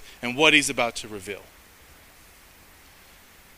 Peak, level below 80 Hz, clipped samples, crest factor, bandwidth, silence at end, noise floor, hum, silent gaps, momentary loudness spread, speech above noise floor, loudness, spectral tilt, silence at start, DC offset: -2 dBFS; -56 dBFS; under 0.1%; 26 dB; 16 kHz; 2.15 s; -52 dBFS; none; none; 20 LU; 28 dB; -21 LUFS; -2 dB/octave; 0 s; under 0.1%